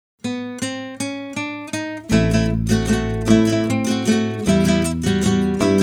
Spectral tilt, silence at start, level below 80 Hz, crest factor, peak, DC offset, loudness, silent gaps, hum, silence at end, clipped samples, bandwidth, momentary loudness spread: -5.5 dB/octave; 0.25 s; -34 dBFS; 16 dB; -2 dBFS; under 0.1%; -19 LUFS; none; none; 0 s; under 0.1%; 17 kHz; 10 LU